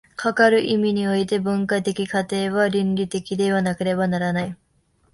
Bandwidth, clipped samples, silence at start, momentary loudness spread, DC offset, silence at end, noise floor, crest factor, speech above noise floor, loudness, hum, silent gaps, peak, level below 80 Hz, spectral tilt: 11.5 kHz; under 0.1%; 0.2 s; 7 LU; under 0.1%; 0.6 s; -63 dBFS; 16 dB; 42 dB; -21 LUFS; none; none; -4 dBFS; -56 dBFS; -6 dB/octave